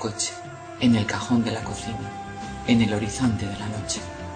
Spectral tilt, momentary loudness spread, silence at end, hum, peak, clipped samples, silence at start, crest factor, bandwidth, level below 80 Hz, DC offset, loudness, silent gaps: -5 dB/octave; 14 LU; 0 s; none; -6 dBFS; under 0.1%; 0 s; 18 dB; 9.4 kHz; -46 dBFS; under 0.1%; -25 LUFS; none